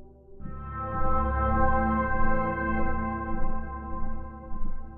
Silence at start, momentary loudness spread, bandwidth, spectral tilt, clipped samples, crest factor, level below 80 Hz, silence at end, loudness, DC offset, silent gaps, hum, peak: 0 s; 15 LU; 3.3 kHz; -11 dB/octave; under 0.1%; 14 dB; -30 dBFS; 0 s; -29 LUFS; under 0.1%; none; none; -12 dBFS